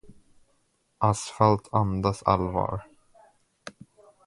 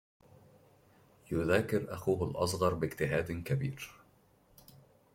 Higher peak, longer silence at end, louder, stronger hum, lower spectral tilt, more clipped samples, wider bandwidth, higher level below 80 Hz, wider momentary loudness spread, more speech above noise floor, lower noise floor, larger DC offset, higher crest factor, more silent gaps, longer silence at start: first, -4 dBFS vs -14 dBFS; second, 0.55 s vs 1.2 s; first, -26 LUFS vs -33 LUFS; neither; about the same, -6.5 dB/octave vs -6 dB/octave; neither; second, 11.5 kHz vs 16.5 kHz; first, -48 dBFS vs -60 dBFS; first, 23 LU vs 8 LU; first, 45 dB vs 33 dB; first, -70 dBFS vs -66 dBFS; neither; about the same, 24 dB vs 22 dB; neither; second, 0.1 s vs 1.3 s